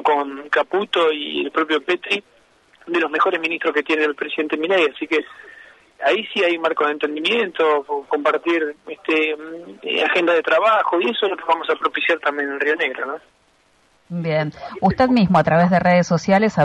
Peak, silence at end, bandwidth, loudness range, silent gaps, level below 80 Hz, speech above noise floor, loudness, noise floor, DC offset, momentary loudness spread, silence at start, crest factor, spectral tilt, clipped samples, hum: -6 dBFS; 0 s; 10.5 kHz; 3 LU; none; -54 dBFS; 40 dB; -19 LUFS; -59 dBFS; under 0.1%; 8 LU; 0 s; 14 dB; -6 dB/octave; under 0.1%; none